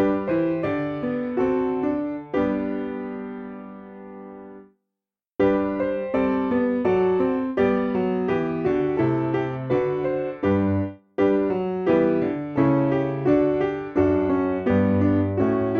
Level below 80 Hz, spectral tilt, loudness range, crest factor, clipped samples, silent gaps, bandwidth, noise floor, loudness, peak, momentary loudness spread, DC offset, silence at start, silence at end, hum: -52 dBFS; -10 dB/octave; 7 LU; 16 dB; under 0.1%; none; 6.2 kHz; -87 dBFS; -23 LUFS; -6 dBFS; 11 LU; under 0.1%; 0 s; 0 s; none